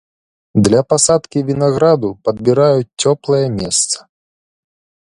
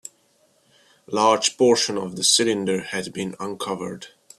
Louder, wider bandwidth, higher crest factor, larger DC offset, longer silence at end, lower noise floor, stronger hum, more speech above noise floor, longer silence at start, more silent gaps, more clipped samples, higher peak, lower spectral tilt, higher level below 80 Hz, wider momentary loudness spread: first, -14 LUFS vs -21 LUFS; second, 11.5 kHz vs 14 kHz; second, 16 dB vs 22 dB; neither; first, 1.05 s vs 0.3 s; first, under -90 dBFS vs -62 dBFS; neither; first, over 76 dB vs 40 dB; second, 0.55 s vs 1.1 s; neither; neither; about the same, 0 dBFS vs -2 dBFS; first, -5 dB/octave vs -2.5 dB/octave; first, -46 dBFS vs -66 dBFS; second, 7 LU vs 13 LU